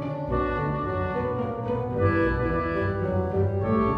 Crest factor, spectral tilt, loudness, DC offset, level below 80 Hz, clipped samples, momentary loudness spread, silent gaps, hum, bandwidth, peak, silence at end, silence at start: 16 dB; -10 dB/octave; -26 LUFS; under 0.1%; -38 dBFS; under 0.1%; 5 LU; none; none; 5.2 kHz; -10 dBFS; 0 s; 0 s